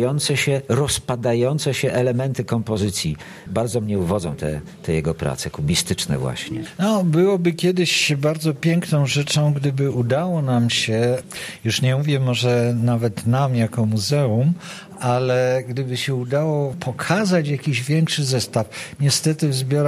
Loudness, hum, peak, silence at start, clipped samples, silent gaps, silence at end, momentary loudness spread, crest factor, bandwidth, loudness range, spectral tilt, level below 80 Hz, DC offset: -20 LUFS; none; -2 dBFS; 0 s; under 0.1%; none; 0 s; 7 LU; 18 dB; 14.5 kHz; 4 LU; -5 dB/octave; -48 dBFS; under 0.1%